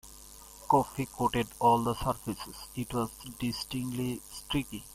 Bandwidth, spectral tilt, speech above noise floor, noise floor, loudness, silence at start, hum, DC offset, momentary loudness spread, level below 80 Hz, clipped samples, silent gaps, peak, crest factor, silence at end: 16 kHz; -5 dB/octave; 19 dB; -51 dBFS; -32 LUFS; 0.05 s; none; under 0.1%; 14 LU; -52 dBFS; under 0.1%; none; -12 dBFS; 20 dB; 0 s